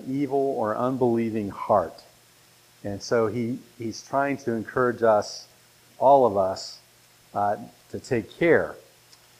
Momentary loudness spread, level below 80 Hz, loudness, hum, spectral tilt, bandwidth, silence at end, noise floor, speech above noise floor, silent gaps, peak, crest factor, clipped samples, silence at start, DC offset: 15 LU; -62 dBFS; -25 LUFS; none; -6 dB/octave; 15.5 kHz; 0.6 s; -56 dBFS; 32 dB; none; -6 dBFS; 20 dB; under 0.1%; 0 s; under 0.1%